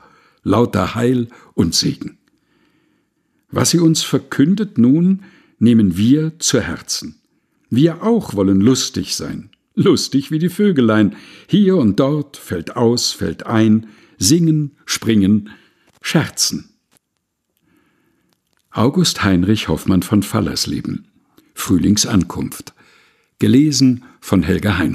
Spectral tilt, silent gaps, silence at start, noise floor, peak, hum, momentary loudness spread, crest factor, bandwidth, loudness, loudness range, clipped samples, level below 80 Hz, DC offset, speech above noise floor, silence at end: -5 dB/octave; none; 0.45 s; -73 dBFS; 0 dBFS; none; 12 LU; 16 dB; 14.5 kHz; -16 LUFS; 4 LU; under 0.1%; -44 dBFS; under 0.1%; 57 dB; 0 s